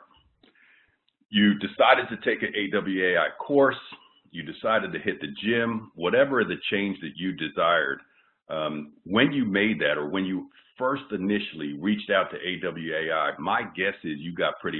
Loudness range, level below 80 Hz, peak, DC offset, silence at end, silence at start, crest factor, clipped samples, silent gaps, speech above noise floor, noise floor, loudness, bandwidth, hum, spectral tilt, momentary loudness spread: 4 LU; -66 dBFS; -4 dBFS; under 0.1%; 0 s; 1.3 s; 22 dB; under 0.1%; none; 40 dB; -66 dBFS; -25 LUFS; 4.3 kHz; none; -9.5 dB/octave; 10 LU